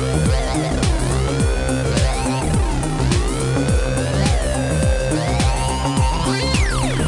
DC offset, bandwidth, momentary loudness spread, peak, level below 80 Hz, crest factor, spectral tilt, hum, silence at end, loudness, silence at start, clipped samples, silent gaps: under 0.1%; 11.5 kHz; 2 LU; -4 dBFS; -22 dBFS; 14 dB; -5 dB/octave; none; 0 s; -19 LUFS; 0 s; under 0.1%; none